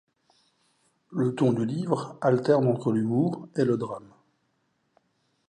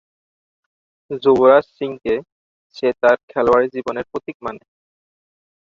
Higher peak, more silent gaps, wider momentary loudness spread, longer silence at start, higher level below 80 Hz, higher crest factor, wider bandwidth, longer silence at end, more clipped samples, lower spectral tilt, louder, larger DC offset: second, -8 dBFS vs -2 dBFS; second, none vs 2.32-2.70 s, 3.23-3.28 s, 4.35-4.40 s; second, 7 LU vs 16 LU; about the same, 1.1 s vs 1.1 s; second, -70 dBFS vs -56 dBFS; about the same, 20 dB vs 18 dB; first, 10 kHz vs 7.2 kHz; first, 1.5 s vs 1.05 s; neither; first, -8.5 dB/octave vs -6.5 dB/octave; second, -26 LUFS vs -17 LUFS; neither